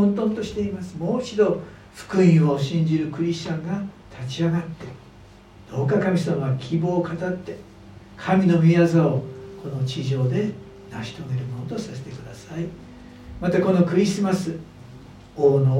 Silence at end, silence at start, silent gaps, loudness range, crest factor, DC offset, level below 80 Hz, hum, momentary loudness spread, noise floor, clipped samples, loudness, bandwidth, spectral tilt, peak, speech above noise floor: 0 s; 0 s; none; 7 LU; 18 dB; under 0.1%; -52 dBFS; none; 21 LU; -47 dBFS; under 0.1%; -22 LUFS; 10.5 kHz; -7.5 dB/octave; -6 dBFS; 25 dB